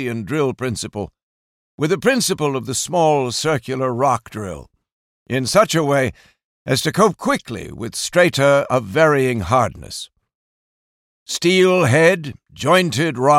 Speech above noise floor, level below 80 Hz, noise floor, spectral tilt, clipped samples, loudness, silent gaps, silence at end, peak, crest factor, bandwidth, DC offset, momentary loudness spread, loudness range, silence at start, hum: over 73 dB; -50 dBFS; under -90 dBFS; -4.5 dB/octave; under 0.1%; -17 LUFS; 1.23-1.78 s, 4.92-5.26 s, 6.44-6.65 s, 10.35-11.26 s; 0 s; -2 dBFS; 16 dB; 16.5 kHz; under 0.1%; 16 LU; 3 LU; 0 s; none